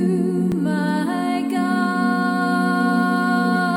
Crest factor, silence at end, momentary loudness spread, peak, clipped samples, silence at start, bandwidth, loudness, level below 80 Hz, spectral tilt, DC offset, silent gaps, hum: 12 dB; 0 s; 3 LU; -8 dBFS; under 0.1%; 0 s; 16.5 kHz; -20 LUFS; -60 dBFS; -6.5 dB/octave; under 0.1%; none; none